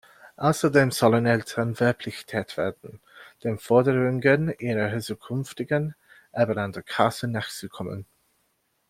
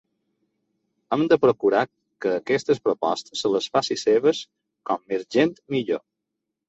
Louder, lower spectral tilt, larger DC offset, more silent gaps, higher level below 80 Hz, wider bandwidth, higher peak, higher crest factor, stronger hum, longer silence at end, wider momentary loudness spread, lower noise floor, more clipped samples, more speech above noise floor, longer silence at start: about the same, -25 LUFS vs -23 LUFS; about the same, -6 dB/octave vs -5 dB/octave; neither; neither; first, -60 dBFS vs -68 dBFS; first, 16 kHz vs 8 kHz; about the same, -4 dBFS vs -4 dBFS; about the same, 22 dB vs 20 dB; neither; first, 0.85 s vs 0.7 s; first, 14 LU vs 11 LU; second, -71 dBFS vs -82 dBFS; neither; second, 47 dB vs 60 dB; second, 0.25 s vs 1.1 s